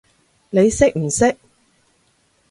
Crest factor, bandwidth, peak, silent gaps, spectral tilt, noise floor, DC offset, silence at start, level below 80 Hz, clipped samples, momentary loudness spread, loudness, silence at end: 20 dB; 11.5 kHz; 0 dBFS; none; -5 dB/octave; -61 dBFS; under 0.1%; 0.55 s; -42 dBFS; under 0.1%; 7 LU; -17 LUFS; 1.15 s